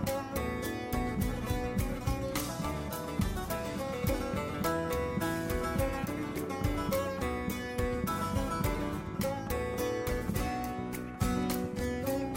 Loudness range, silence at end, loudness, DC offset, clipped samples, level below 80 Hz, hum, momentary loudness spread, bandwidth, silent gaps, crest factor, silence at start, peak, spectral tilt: 1 LU; 0 s; -34 LUFS; under 0.1%; under 0.1%; -42 dBFS; none; 3 LU; 16.5 kHz; none; 14 dB; 0 s; -18 dBFS; -5.5 dB/octave